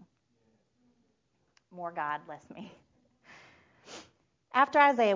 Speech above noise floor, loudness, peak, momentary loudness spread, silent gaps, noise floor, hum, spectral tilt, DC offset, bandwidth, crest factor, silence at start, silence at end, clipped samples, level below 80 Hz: 47 dB; -28 LUFS; -10 dBFS; 26 LU; none; -75 dBFS; none; -4.5 dB/octave; under 0.1%; 7.6 kHz; 24 dB; 1.75 s; 0 s; under 0.1%; -80 dBFS